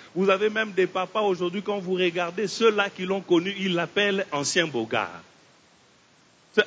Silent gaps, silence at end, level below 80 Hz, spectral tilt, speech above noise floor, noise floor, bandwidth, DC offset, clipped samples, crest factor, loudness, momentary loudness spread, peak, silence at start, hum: none; 0 s; -72 dBFS; -4 dB/octave; 34 dB; -58 dBFS; 8 kHz; under 0.1%; under 0.1%; 20 dB; -25 LUFS; 6 LU; -6 dBFS; 0 s; none